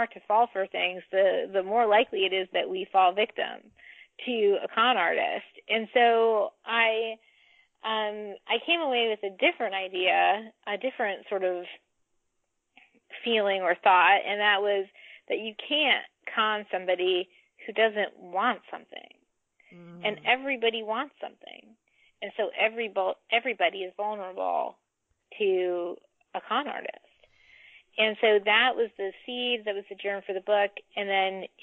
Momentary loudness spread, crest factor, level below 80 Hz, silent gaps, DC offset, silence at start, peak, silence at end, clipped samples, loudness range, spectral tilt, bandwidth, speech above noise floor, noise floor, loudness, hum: 14 LU; 18 dB; -82 dBFS; none; under 0.1%; 0 s; -10 dBFS; 0.15 s; under 0.1%; 6 LU; -6 dB/octave; 4.2 kHz; 50 dB; -77 dBFS; -26 LUFS; none